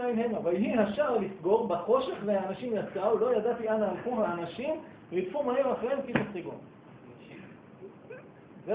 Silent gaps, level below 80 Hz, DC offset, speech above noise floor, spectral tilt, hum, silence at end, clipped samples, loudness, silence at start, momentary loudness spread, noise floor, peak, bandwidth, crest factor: none; -66 dBFS; under 0.1%; 21 dB; -10 dB/octave; none; 0 s; under 0.1%; -30 LUFS; 0 s; 21 LU; -51 dBFS; -10 dBFS; 4 kHz; 20 dB